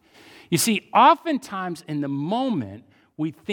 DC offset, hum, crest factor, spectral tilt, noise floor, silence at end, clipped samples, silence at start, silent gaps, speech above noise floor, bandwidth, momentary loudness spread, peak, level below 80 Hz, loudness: under 0.1%; none; 20 dB; -4 dB/octave; -50 dBFS; 0 s; under 0.1%; 0.5 s; none; 28 dB; 19 kHz; 15 LU; -4 dBFS; -70 dBFS; -22 LUFS